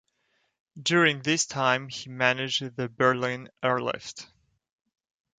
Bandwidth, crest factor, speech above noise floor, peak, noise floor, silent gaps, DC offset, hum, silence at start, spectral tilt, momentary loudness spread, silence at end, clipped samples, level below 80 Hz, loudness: 9.6 kHz; 22 dB; 46 dB; -6 dBFS; -73 dBFS; none; under 0.1%; none; 0.75 s; -3.5 dB/octave; 13 LU; 1.15 s; under 0.1%; -70 dBFS; -26 LUFS